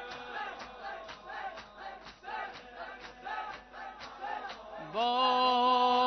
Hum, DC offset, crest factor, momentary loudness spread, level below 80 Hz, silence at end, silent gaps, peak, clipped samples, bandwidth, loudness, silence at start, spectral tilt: none; under 0.1%; 18 dB; 19 LU; -66 dBFS; 0 s; none; -16 dBFS; under 0.1%; 6.2 kHz; -33 LUFS; 0 s; 0.5 dB/octave